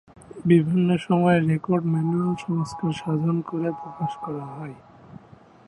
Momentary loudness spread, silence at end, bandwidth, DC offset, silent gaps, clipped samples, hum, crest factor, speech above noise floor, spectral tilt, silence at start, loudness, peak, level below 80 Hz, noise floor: 13 LU; 0.5 s; 10.5 kHz; under 0.1%; none; under 0.1%; none; 18 dB; 28 dB; -8 dB/octave; 0.35 s; -23 LUFS; -6 dBFS; -60 dBFS; -50 dBFS